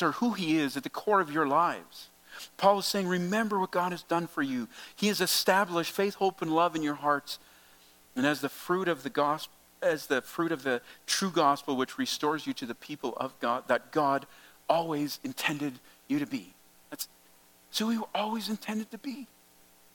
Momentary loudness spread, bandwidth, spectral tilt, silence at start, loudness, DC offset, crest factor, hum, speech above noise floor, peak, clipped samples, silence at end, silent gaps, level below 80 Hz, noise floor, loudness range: 14 LU; 17.5 kHz; -4 dB/octave; 0 s; -30 LUFS; under 0.1%; 22 dB; none; 30 dB; -10 dBFS; under 0.1%; 0.7 s; none; -76 dBFS; -60 dBFS; 6 LU